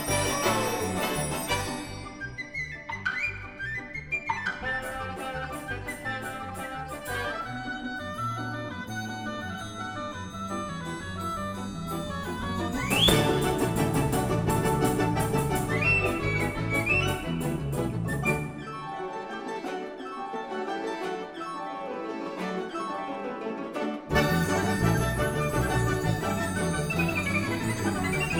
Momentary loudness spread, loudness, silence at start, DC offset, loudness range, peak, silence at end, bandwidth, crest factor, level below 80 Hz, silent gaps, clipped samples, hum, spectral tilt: 10 LU; -29 LUFS; 0 s; under 0.1%; 9 LU; -8 dBFS; 0 s; 19 kHz; 22 dB; -44 dBFS; none; under 0.1%; none; -4.5 dB/octave